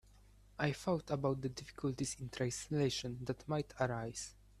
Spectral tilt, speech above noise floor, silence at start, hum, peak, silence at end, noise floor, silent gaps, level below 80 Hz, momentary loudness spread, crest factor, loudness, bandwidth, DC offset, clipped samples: -5 dB/octave; 24 dB; 0.15 s; none; -18 dBFS; 0.3 s; -63 dBFS; none; -62 dBFS; 8 LU; 22 dB; -39 LUFS; 13.5 kHz; under 0.1%; under 0.1%